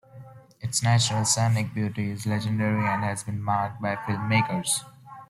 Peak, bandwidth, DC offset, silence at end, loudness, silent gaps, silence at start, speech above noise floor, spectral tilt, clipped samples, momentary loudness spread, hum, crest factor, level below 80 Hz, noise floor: -10 dBFS; 14 kHz; under 0.1%; 0.05 s; -25 LUFS; none; 0.15 s; 22 dB; -4 dB/octave; under 0.1%; 8 LU; none; 16 dB; -60 dBFS; -47 dBFS